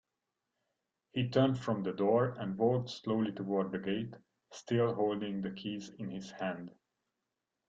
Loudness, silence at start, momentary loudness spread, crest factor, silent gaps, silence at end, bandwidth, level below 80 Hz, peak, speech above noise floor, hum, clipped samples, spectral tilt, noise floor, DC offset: -34 LUFS; 1.15 s; 13 LU; 20 dB; none; 0.95 s; 7.8 kHz; -72 dBFS; -16 dBFS; 54 dB; none; under 0.1%; -7 dB/octave; -88 dBFS; under 0.1%